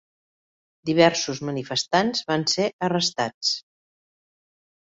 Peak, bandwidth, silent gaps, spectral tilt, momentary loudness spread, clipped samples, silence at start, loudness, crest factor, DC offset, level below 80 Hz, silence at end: -4 dBFS; 8 kHz; 2.73-2.79 s, 3.34-3.41 s; -3.5 dB/octave; 9 LU; under 0.1%; 0.85 s; -23 LUFS; 22 dB; under 0.1%; -64 dBFS; 1.25 s